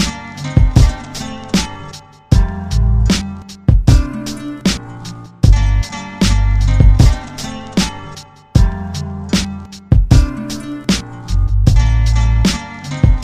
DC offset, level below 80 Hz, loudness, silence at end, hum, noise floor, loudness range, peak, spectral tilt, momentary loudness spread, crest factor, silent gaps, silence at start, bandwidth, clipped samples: under 0.1%; -16 dBFS; -16 LUFS; 0 s; none; -34 dBFS; 2 LU; 0 dBFS; -5.5 dB/octave; 14 LU; 14 dB; none; 0 s; 14 kHz; 0.1%